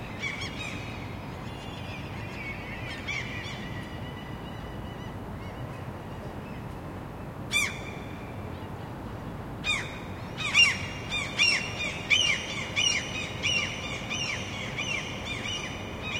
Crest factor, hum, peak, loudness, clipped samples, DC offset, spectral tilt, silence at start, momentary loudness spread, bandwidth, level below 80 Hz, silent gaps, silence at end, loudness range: 24 dB; none; -8 dBFS; -30 LUFS; under 0.1%; under 0.1%; -2.5 dB/octave; 0 s; 16 LU; 16.5 kHz; -50 dBFS; none; 0 s; 13 LU